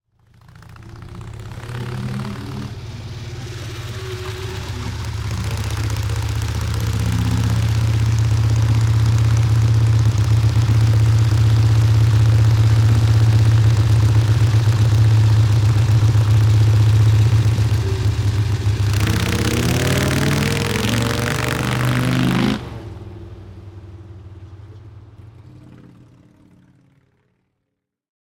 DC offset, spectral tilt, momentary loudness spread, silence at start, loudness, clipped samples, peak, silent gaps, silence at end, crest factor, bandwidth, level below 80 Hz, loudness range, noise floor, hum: under 0.1%; -6 dB/octave; 17 LU; 0.7 s; -17 LUFS; under 0.1%; -4 dBFS; none; 2.95 s; 12 dB; 17 kHz; -32 dBFS; 14 LU; -77 dBFS; none